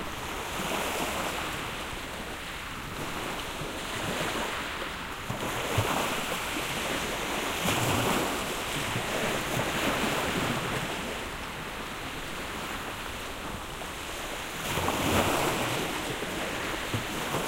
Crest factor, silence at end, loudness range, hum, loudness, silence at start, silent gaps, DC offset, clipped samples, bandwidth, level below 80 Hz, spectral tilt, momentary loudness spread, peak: 22 dB; 0 s; 5 LU; none; -31 LUFS; 0 s; none; under 0.1%; under 0.1%; 16 kHz; -46 dBFS; -3.5 dB/octave; 9 LU; -10 dBFS